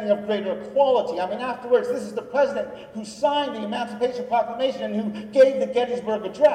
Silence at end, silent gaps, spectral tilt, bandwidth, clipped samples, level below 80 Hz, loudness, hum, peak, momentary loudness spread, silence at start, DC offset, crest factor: 0 s; none; -5 dB/octave; 9.8 kHz; under 0.1%; -64 dBFS; -23 LUFS; none; -6 dBFS; 10 LU; 0 s; under 0.1%; 16 dB